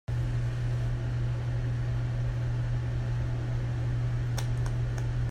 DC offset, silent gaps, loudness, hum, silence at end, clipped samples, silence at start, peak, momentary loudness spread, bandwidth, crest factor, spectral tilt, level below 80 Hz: under 0.1%; none; -31 LUFS; none; 0 s; under 0.1%; 0.1 s; -20 dBFS; 1 LU; 9.4 kHz; 10 dB; -7 dB/octave; -38 dBFS